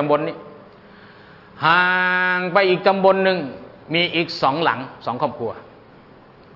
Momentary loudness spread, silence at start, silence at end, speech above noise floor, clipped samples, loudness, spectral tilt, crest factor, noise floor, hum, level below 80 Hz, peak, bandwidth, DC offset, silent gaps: 14 LU; 0 s; 0.9 s; 28 dB; under 0.1%; -19 LUFS; -6.5 dB/octave; 18 dB; -46 dBFS; none; -62 dBFS; -2 dBFS; 6 kHz; under 0.1%; none